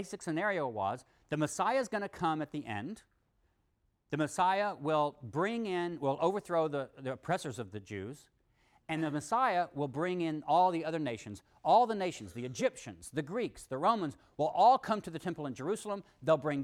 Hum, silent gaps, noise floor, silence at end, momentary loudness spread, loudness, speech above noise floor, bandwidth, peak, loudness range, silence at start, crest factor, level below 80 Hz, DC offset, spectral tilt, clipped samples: none; none; -76 dBFS; 0 s; 13 LU; -33 LUFS; 43 dB; 14.5 kHz; -16 dBFS; 5 LU; 0 s; 18 dB; -70 dBFS; under 0.1%; -5.5 dB/octave; under 0.1%